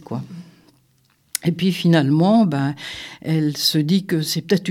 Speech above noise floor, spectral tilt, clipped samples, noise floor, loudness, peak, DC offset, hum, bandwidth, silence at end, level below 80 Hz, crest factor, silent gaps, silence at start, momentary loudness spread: 42 dB; -5.5 dB/octave; under 0.1%; -61 dBFS; -19 LUFS; -2 dBFS; under 0.1%; none; 16.5 kHz; 0 s; -62 dBFS; 18 dB; none; 0.1 s; 15 LU